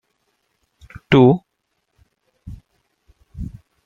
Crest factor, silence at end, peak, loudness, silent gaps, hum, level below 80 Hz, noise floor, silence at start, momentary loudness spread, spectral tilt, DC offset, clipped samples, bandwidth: 20 dB; 0.4 s; -2 dBFS; -15 LUFS; none; none; -44 dBFS; -72 dBFS; 1.1 s; 28 LU; -8.5 dB/octave; under 0.1%; under 0.1%; 7 kHz